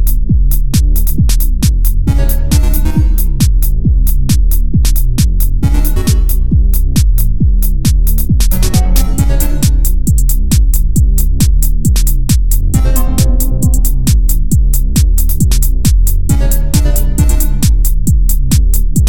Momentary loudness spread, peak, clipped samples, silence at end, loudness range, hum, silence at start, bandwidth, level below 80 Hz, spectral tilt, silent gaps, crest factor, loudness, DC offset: 1 LU; 0 dBFS; under 0.1%; 0 s; 0 LU; none; 0 s; 20 kHz; -10 dBFS; -5.5 dB/octave; none; 10 dB; -13 LUFS; 10%